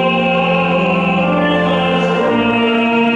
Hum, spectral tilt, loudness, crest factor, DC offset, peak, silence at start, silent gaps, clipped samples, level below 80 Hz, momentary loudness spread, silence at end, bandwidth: none; -7 dB/octave; -14 LUFS; 10 dB; under 0.1%; -4 dBFS; 0 s; none; under 0.1%; -46 dBFS; 1 LU; 0 s; 8.2 kHz